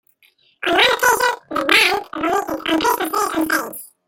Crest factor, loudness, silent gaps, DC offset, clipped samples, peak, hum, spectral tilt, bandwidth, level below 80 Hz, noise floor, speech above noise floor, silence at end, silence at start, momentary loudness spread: 18 dB; -17 LUFS; none; under 0.1%; under 0.1%; 0 dBFS; none; -1.5 dB/octave; 17 kHz; -54 dBFS; -57 dBFS; 39 dB; 0.2 s; 0.6 s; 8 LU